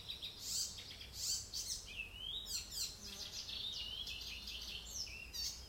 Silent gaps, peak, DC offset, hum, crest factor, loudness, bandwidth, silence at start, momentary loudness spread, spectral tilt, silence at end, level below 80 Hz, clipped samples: none; -28 dBFS; under 0.1%; none; 18 dB; -43 LUFS; 16.5 kHz; 0 s; 6 LU; 0 dB/octave; 0 s; -60 dBFS; under 0.1%